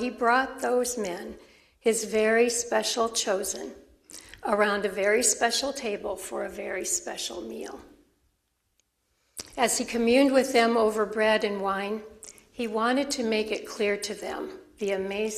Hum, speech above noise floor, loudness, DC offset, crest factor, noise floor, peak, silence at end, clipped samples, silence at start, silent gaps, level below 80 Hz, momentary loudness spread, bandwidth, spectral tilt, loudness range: none; 48 dB; -26 LUFS; under 0.1%; 20 dB; -75 dBFS; -8 dBFS; 0 s; under 0.1%; 0 s; none; -60 dBFS; 17 LU; 15 kHz; -2 dB/octave; 8 LU